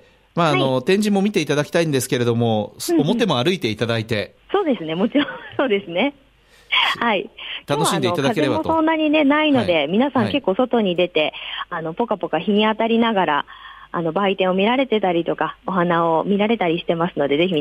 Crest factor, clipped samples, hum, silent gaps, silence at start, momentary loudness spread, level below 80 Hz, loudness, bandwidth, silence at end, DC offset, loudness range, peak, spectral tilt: 14 dB; under 0.1%; none; none; 0.35 s; 7 LU; -56 dBFS; -19 LUFS; 16 kHz; 0 s; under 0.1%; 3 LU; -6 dBFS; -5 dB/octave